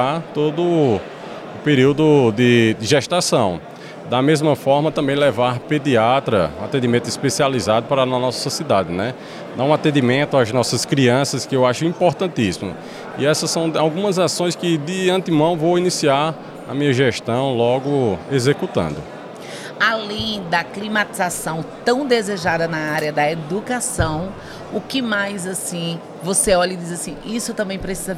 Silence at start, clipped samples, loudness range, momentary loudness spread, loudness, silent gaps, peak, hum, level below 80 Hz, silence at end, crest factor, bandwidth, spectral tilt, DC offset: 0 s; under 0.1%; 4 LU; 11 LU; -18 LUFS; none; -2 dBFS; none; -48 dBFS; 0 s; 16 dB; 16 kHz; -4.5 dB/octave; under 0.1%